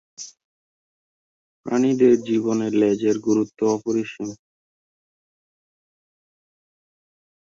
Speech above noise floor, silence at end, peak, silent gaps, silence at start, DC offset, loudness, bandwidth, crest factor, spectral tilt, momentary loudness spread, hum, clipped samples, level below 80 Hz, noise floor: over 70 dB; 3.1 s; -6 dBFS; 0.44-1.64 s; 0.2 s; under 0.1%; -21 LUFS; 7.8 kHz; 20 dB; -6 dB/octave; 20 LU; none; under 0.1%; -66 dBFS; under -90 dBFS